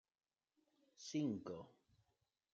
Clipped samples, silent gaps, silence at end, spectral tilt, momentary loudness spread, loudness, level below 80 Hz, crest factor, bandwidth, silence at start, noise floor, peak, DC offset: under 0.1%; none; 0.85 s; -5.5 dB/octave; 15 LU; -46 LUFS; -88 dBFS; 18 dB; 7.8 kHz; 1 s; -87 dBFS; -32 dBFS; under 0.1%